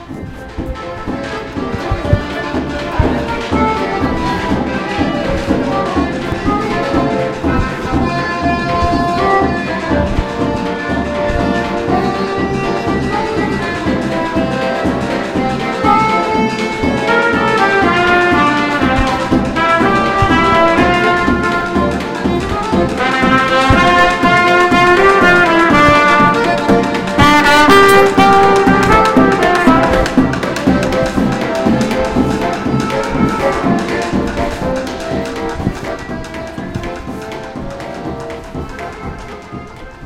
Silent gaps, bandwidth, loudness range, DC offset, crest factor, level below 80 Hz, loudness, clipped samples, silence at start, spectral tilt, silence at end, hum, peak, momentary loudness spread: none; 16.5 kHz; 10 LU; under 0.1%; 14 dB; -28 dBFS; -13 LUFS; under 0.1%; 0 s; -5.5 dB/octave; 0 s; none; 0 dBFS; 15 LU